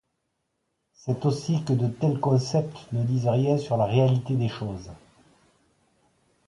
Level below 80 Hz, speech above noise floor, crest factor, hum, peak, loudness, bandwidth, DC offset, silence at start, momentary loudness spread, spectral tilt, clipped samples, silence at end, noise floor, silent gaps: -58 dBFS; 53 dB; 18 dB; none; -8 dBFS; -25 LUFS; 11 kHz; under 0.1%; 1.05 s; 12 LU; -8 dB/octave; under 0.1%; 1.5 s; -77 dBFS; none